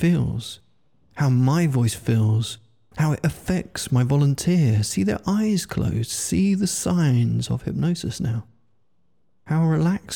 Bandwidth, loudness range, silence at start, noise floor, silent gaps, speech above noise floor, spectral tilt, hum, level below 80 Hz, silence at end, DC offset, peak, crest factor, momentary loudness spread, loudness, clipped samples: 18 kHz; 2 LU; 0 s; -71 dBFS; none; 50 dB; -6 dB/octave; none; -48 dBFS; 0 s; 0.1%; -10 dBFS; 12 dB; 8 LU; -22 LUFS; under 0.1%